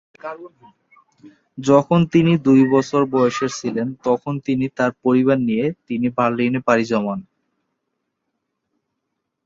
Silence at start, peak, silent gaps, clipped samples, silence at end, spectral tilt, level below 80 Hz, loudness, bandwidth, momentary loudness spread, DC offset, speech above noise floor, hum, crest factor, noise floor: 0.25 s; -2 dBFS; none; under 0.1%; 2.25 s; -7 dB/octave; -58 dBFS; -18 LUFS; 7.8 kHz; 11 LU; under 0.1%; 59 dB; none; 18 dB; -77 dBFS